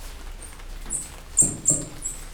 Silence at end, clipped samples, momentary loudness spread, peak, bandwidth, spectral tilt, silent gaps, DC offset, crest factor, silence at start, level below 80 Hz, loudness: 0 s; under 0.1%; 23 LU; -4 dBFS; over 20 kHz; -2.5 dB/octave; none; under 0.1%; 22 dB; 0 s; -38 dBFS; -23 LUFS